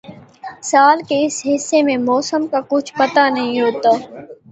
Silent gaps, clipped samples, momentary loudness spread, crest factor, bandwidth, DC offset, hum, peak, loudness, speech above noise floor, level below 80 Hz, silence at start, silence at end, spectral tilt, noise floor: none; under 0.1%; 15 LU; 16 dB; 8.8 kHz; under 0.1%; none; 0 dBFS; -16 LUFS; 20 dB; -64 dBFS; 0.05 s; 0.15 s; -3 dB/octave; -35 dBFS